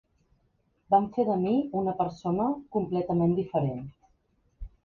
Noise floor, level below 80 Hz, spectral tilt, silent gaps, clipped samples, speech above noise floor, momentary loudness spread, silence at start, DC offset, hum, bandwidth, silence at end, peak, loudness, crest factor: -71 dBFS; -54 dBFS; -10 dB/octave; none; under 0.1%; 44 dB; 6 LU; 0.9 s; under 0.1%; none; 7 kHz; 0.2 s; -10 dBFS; -28 LUFS; 18 dB